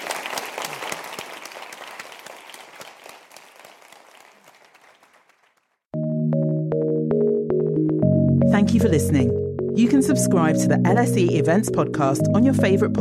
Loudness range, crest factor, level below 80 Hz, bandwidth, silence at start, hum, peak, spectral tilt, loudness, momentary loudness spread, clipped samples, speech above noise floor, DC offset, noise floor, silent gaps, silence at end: 20 LU; 14 dB; -54 dBFS; 16 kHz; 0 s; none; -6 dBFS; -6.5 dB/octave; -20 LUFS; 19 LU; under 0.1%; 47 dB; under 0.1%; -65 dBFS; none; 0 s